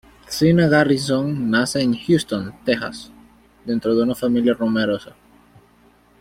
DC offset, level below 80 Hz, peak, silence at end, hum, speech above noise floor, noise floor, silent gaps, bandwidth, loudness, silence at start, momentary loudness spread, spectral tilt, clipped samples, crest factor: under 0.1%; -52 dBFS; -2 dBFS; 1.15 s; none; 35 dB; -54 dBFS; none; 16 kHz; -19 LUFS; 0.3 s; 11 LU; -6 dB/octave; under 0.1%; 18 dB